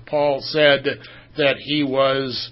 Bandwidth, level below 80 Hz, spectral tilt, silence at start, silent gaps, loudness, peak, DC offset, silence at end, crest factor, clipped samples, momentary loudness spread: 5.8 kHz; -56 dBFS; -8.5 dB/octave; 0 s; none; -19 LUFS; 0 dBFS; under 0.1%; 0 s; 20 dB; under 0.1%; 10 LU